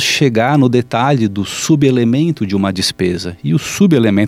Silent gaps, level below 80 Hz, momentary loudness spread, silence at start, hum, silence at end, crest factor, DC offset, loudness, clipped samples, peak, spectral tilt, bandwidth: none; -48 dBFS; 6 LU; 0 s; none; 0 s; 12 dB; under 0.1%; -14 LUFS; under 0.1%; 0 dBFS; -5.5 dB/octave; 16 kHz